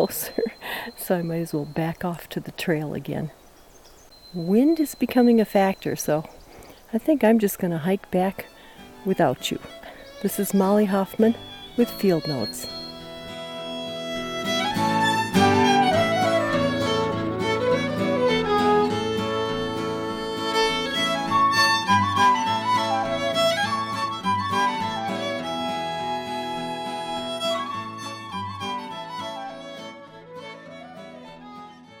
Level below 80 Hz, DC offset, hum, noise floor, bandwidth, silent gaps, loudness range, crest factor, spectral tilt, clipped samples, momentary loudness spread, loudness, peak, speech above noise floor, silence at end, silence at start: -54 dBFS; under 0.1%; none; -50 dBFS; 19 kHz; none; 9 LU; 18 dB; -4.5 dB/octave; under 0.1%; 17 LU; -23 LUFS; -6 dBFS; 27 dB; 0 s; 0 s